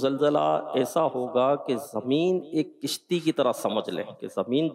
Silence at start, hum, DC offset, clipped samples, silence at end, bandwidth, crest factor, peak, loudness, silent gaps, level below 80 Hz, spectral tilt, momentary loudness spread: 0 s; none; under 0.1%; under 0.1%; 0 s; 16 kHz; 14 dB; -12 dBFS; -26 LUFS; none; -78 dBFS; -5.5 dB/octave; 8 LU